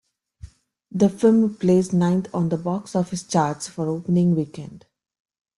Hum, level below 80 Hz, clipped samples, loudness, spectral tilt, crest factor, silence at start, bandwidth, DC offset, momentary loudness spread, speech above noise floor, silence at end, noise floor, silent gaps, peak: none; -56 dBFS; under 0.1%; -21 LUFS; -7 dB/octave; 18 dB; 0.45 s; 11.5 kHz; under 0.1%; 10 LU; 24 dB; 0.8 s; -45 dBFS; none; -6 dBFS